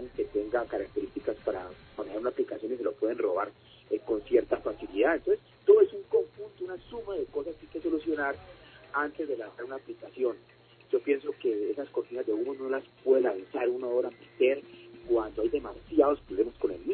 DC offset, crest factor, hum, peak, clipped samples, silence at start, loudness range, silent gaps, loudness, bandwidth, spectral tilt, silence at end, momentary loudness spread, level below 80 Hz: under 0.1%; 20 dB; none; -10 dBFS; under 0.1%; 0 s; 7 LU; none; -30 LUFS; 4.5 kHz; -9 dB/octave; 0 s; 13 LU; -60 dBFS